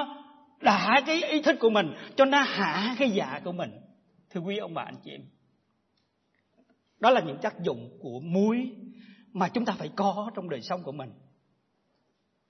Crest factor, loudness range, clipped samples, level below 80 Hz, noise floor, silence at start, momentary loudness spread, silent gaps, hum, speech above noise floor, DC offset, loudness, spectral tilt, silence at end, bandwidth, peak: 22 dB; 11 LU; under 0.1%; -80 dBFS; -74 dBFS; 0 s; 18 LU; none; none; 47 dB; under 0.1%; -27 LUFS; -5.5 dB/octave; 1.35 s; 6.4 kHz; -8 dBFS